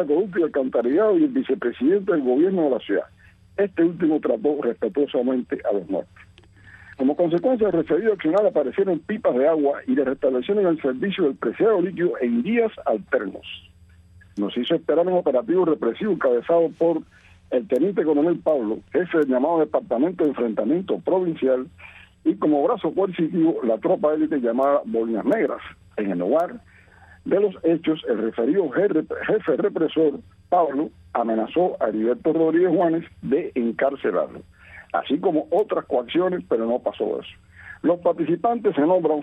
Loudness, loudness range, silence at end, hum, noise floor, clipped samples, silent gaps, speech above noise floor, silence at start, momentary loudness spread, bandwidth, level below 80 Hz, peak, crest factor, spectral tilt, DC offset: -22 LUFS; 3 LU; 0 s; none; -51 dBFS; under 0.1%; none; 29 dB; 0 s; 7 LU; 4 kHz; -60 dBFS; -8 dBFS; 14 dB; -8.5 dB/octave; under 0.1%